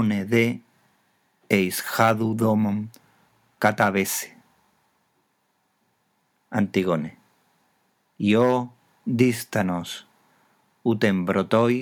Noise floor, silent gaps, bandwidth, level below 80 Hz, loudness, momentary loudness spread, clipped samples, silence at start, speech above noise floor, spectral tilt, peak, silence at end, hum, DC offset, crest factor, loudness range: -70 dBFS; none; 19.5 kHz; -70 dBFS; -23 LUFS; 14 LU; under 0.1%; 0 s; 48 dB; -5.5 dB/octave; -4 dBFS; 0 s; none; under 0.1%; 22 dB; 7 LU